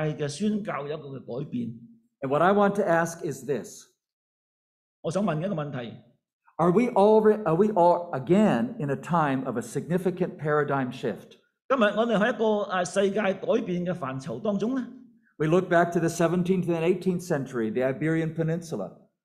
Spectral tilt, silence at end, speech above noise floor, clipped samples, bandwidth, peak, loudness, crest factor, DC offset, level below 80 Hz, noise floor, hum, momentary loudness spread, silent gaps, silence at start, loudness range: -6.5 dB/octave; 0.3 s; over 65 dB; under 0.1%; 14 kHz; -8 dBFS; -26 LUFS; 18 dB; under 0.1%; -66 dBFS; under -90 dBFS; none; 13 LU; 4.13-5.03 s, 6.33-6.40 s, 11.64-11.69 s; 0 s; 5 LU